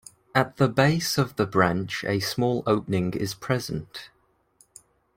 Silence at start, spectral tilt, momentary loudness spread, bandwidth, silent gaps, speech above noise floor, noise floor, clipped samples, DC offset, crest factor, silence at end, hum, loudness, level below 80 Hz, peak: 0.35 s; -5.5 dB/octave; 9 LU; 16.5 kHz; none; 38 dB; -62 dBFS; under 0.1%; under 0.1%; 22 dB; 1.1 s; none; -25 LUFS; -56 dBFS; -4 dBFS